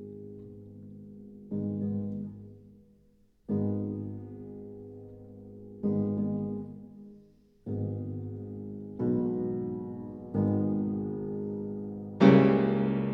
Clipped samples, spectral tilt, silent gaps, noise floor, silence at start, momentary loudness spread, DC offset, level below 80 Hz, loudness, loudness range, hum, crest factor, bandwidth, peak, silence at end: under 0.1%; -10 dB/octave; none; -64 dBFS; 0 s; 22 LU; under 0.1%; -60 dBFS; -30 LUFS; 11 LU; none; 24 dB; 6 kHz; -6 dBFS; 0 s